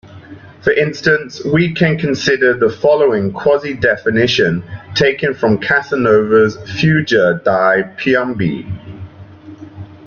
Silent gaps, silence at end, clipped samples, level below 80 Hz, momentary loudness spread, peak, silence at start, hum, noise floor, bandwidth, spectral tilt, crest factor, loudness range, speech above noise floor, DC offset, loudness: none; 0 s; under 0.1%; -46 dBFS; 8 LU; -2 dBFS; 0.05 s; none; -36 dBFS; 7.2 kHz; -6 dB/octave; 14 dB; 1 LU; 22 dB; under 0.1%; -14 LUFS